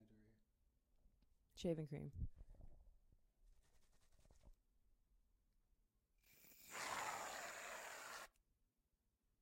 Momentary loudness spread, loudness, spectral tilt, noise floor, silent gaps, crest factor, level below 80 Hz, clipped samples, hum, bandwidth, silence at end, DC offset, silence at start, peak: 21 LU; -50 LUFS; -4 dB/octave; -87 dBFS; none; 24 dB; -66 dBFS; under 0.1%; none; 16.5 kHz; 1.1 s; under 0.1%; 0 s; -32 dBFS